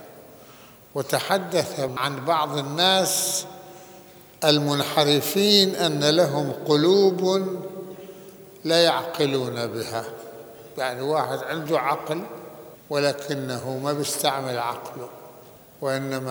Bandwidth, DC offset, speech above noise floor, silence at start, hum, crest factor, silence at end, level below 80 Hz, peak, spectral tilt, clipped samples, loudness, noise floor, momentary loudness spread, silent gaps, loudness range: over 20 kHz; under 0.1%; 25 dB; 0 s; none; 22 dB; 0 s; -68 dBFS; -2 dBFS; -3.5 dB/octave; under 0.1%; -23 LUFS; -48 dBFS; 20 LU; none; 7 LU